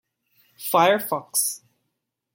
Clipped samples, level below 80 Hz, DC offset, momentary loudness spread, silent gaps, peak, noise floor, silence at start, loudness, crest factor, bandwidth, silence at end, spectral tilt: under 0.1%; -80 dBFS; under 0.1%; 14 LU; none; -4 dBFS; -79 dBFS; 0.6 s; -21 LUFS; 20 dB; 17 kHz; 0.75 s; -2.5 dB/octave